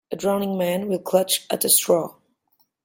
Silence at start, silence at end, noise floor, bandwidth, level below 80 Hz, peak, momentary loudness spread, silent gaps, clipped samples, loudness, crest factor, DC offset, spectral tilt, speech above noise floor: 0.1 s; 0.75 s; -67 dBFS; 17 kHz; -68 dBFS; -2 dBFS; 8 LU; none; under 0.1%; -21 LUFS; 20 dB; under 0.1%; -3 dB/octave; 46 dB